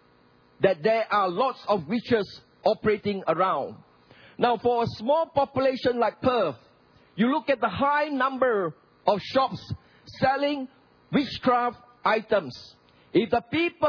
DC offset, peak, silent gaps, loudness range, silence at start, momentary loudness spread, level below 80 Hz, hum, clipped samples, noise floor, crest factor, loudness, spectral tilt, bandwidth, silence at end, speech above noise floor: under 0.1%; -4 dBFS; none; 2 LU; 0.6 s; 7 LU; -60 dBFS; none; under 0.1%; -59 dBFS; 20 dB; -25 LUFS; -7 dB/octave; 5.4 kHz; 0 s; 35 dB